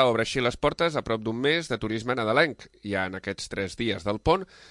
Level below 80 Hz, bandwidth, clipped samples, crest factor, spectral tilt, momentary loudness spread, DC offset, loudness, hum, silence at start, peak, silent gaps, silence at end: -48 dBFS; 11.5 kHz; under 0.1%; 18 dB; -5 dB/octave; 9 LU; under 0.1%; -27 LUFS; none; 0 s; -8 dBFS; none; 0.25 s